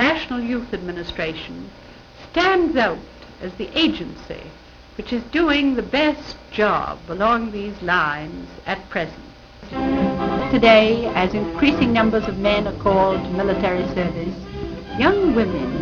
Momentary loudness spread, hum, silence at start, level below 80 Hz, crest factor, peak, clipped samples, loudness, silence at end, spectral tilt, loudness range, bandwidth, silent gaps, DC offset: 15 LU; none; 0 s; -40 dBFS; 20 dB; 0 dBFS; under 0.1%; -20 LUFS; 0 s; -6.5 dB/octave; 6 LU; 7.2 kHz; none; under 0.1%